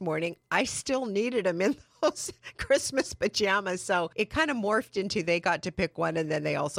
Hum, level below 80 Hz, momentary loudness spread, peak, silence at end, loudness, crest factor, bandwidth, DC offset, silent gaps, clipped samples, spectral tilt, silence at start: none; -56 dBFS; 5 LU; -10 dBFS; 0 s; -28 LUFS; 18 dB; 16 kHz; under 0.1%; none; under 0.1%; -4 dB/octave; 0 s